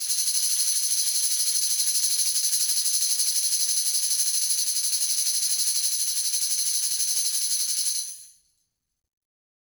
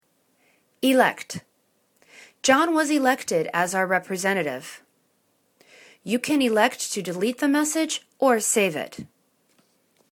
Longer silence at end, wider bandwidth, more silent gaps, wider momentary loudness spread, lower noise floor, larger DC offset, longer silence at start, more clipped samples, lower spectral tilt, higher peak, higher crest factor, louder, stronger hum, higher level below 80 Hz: first, 1.4 s vs 1.05 s; about the same, over 20 kHz vs 19 kHz; neither; second, 2 LU vs 16 LU; first, -75 dBFS vs -68 dBFS; neither; second, 0 s vs 0.8 s; neither; second, 7.5 dB/octave vs -3 dB/octave; second, -8 dBFS vs -4 dBFS; second, 16 dB vs 22 dB; about the same, -21 LUFS vs -22 LUFS; neither; second, -80 dBFS vs -72 dBFS